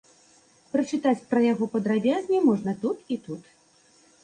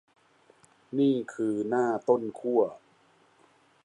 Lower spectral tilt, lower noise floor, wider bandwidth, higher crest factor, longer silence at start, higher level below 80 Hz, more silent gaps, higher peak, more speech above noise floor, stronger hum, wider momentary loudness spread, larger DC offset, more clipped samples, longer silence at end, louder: about the same, -6.5 dB/octave vs -7 dB/octave; about the same, -60 dBFS vs -63 dBFS; about the same, 9.8 kHz vs 10.5 kHz; about the same, 16 dB vs 20 dB; second, 0.75 s vs 0.9 s; first, -70 dBFS vs -80 dBFS; neither; about the same, -10 dBFS vs -10 dBFS; about the same, 35 dB vs 36 dB; neither; first, 11 LU vs 5 LU; neither; neither; second, 0.8 s vs 1.1 s; first, -25 LUFS vs -28 LUFS